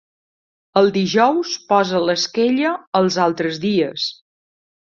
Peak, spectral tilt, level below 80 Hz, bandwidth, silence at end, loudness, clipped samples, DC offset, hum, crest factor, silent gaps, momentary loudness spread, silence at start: -2 dBFS; -4.5 dB/octave; -62 dBFS; 7.4 kHz; 0.8 s; -18 LUFS; under 0.1%; under 0.1%; none; 16 dB; 2.87-2.92 s; 6 LU; 0.75 s